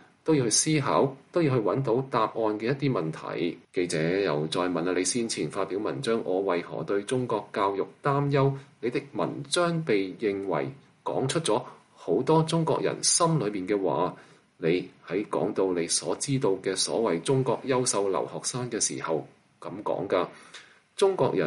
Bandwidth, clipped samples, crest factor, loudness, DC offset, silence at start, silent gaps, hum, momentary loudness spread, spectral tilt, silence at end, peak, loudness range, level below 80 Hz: 11.5 kHz; under 0.1%; 18 dB; -27 LUFS; under 0.1%; 0.25 s; none; none; 8 LU; -4.5 dB/octave; 0 s; -10 dBFS; 3 LU; -68 dBFS